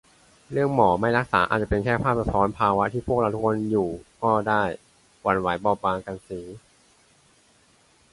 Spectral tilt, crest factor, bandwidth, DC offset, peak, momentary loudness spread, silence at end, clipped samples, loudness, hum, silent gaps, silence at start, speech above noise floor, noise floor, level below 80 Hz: -7 dB/octave; 20 dB; 11.5 kHz; under 0.1%; -4 dBFS; 11 LU; 1.55 s; under 0.1%; -23 LUFS; none; none; 0.5 s; 36 dB; -60 dBFS; -46 dBFS